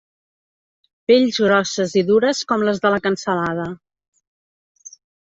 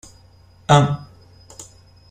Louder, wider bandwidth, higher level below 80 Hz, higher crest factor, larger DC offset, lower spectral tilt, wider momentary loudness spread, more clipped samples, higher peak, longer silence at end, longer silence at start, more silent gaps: about the same, -18 LUFS vs -17 LUFS; second, 8 kHz vs 9.6 kHz; second, -60 dBFS vs -50 dBFS; about the same, 18 dB vs 22 dB; neither; second, -4.5 dB/octave vs -6 dB/octave; second, 11 LU vs 25 LU; neither; about the same, -2 dBFS vs 0 dBFS; first, 1.5 s vs 0.5 s; first, 1.1 s vs 0.7 s; neither